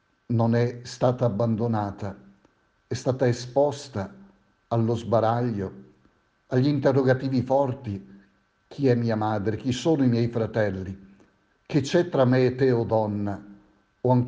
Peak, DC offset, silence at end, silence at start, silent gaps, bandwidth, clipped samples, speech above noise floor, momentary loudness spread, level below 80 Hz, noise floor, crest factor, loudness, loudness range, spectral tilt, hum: -6 dBFS; under 0.1%; 0 s; 0.3 s; none; 8.6 kHz; under 0.1%; 40 dB; 13 LU; -60 dBFS; -64 dBFS; 18 dB; -25 LUFS; 3 LU; -7.5 dB/octave; none